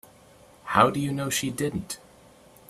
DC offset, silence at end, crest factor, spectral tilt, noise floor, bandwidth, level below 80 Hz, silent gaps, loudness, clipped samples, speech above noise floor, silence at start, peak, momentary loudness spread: under 0.1%; 0.7 s; 24 dB; -4.5 dB/octave; -54 dBFS; 15.5 kHz; -58 dBFS; none; -25 LUFS; under 0.1%; 29 dB; 0.65 s; -4 dBFS; 17 LU